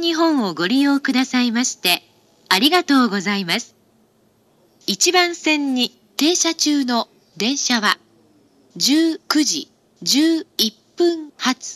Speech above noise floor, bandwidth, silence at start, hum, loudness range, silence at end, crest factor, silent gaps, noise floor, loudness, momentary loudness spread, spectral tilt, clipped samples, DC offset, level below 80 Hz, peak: 40 dB; 15.5 kHz; 0 s; none; 2 LU; 0 s; 18 dB; none; -58 dBFS; -18 LUFS; 8 LU; -2 dB/octave; under 0.1%; under 0.1%; -74 dBFS; 0 dBFS